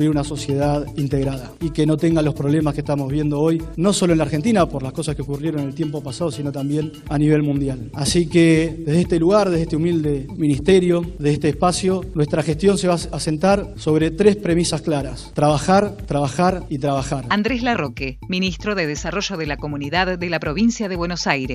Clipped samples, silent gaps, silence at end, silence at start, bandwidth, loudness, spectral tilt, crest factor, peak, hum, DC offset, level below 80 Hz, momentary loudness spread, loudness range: under 0.1%; none; 0 s; 0 s; 13 kHz; -20 LUFS; -6 dB/octave; 18 dB; 0 dBFS; none; under 0.1%; -36 dBFS; 9 LU; 4 LU